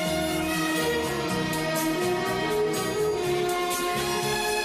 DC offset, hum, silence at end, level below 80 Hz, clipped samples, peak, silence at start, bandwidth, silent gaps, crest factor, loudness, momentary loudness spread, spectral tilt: under 0.1%; none; 0 s; -50 dBFS; under 0.1%; -16 dBFS; 0 s; 15.5 kHz; none; 10 dB; -26 LUFS; 1 LU; -3.5 dB/octave